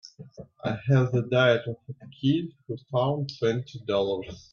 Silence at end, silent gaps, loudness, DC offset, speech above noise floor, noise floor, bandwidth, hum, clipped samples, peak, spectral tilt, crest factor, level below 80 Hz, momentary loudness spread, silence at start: 0.15 s; none; -26 LUFS; under 0.1%; 20 dB; -46 dBFS; 6.8 kHz; none; under 0.1%; -8 dBFS; -7.5 dB/octave; 18 dB; -62 dBFS; 18 LU; 0.05 s